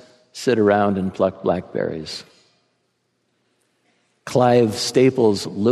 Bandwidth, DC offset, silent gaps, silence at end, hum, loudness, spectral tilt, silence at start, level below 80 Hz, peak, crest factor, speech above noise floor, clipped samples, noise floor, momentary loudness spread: 13.5 kHz; under 0.1%; none; 0 s; none; -19 LUFS; -5.5 dB/octave; 0.35 s; -64 dBFS; -2 dBFS; 18 dB; 51 dB; under 0.1%; -69 dBFS; 15 LU